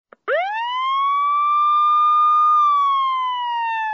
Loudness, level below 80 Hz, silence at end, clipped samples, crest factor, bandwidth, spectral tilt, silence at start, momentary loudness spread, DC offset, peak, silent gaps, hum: -17 LUFS; under -90 dBFS; 0 s; under 0.1%; 8 dB; 6.4 kHz; 6.5 dB/octave; 0.25 s; 8 LU; under 0.1%; -10 dBFS; none; none